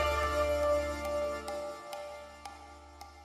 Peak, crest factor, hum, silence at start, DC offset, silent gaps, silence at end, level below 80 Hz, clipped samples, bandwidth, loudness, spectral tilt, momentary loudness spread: -20 dBFS; 14 dB; none; 0 s; under 0.1%; none; 0 s; -46 dBFS; under 0.1%; 15.5 kHz; -33 LUFS; -4.5 dB/octave; 21 LU